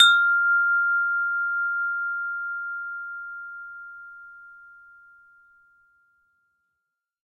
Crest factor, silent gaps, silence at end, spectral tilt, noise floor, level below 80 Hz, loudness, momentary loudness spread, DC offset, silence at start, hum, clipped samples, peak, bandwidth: 22 dB; none; 2.65 s; 5.5 dB/octave; -82 dBFS; -78 dBFS; -23 LUFS; 23 LU; under 0.1%; 0 s; none; under 0.1%; -4 dBFS; 12 kHz